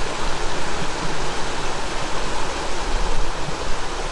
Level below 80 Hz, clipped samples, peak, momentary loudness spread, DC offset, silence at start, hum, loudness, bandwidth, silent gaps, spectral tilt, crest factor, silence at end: -28 dBFS; under 0.1%; -6 dBFS; 2 LU; under 0.1%; 0 s; none; -26 LUFS; 11.5 kHz; none; -3 dB/octave; 12 dB; 0 s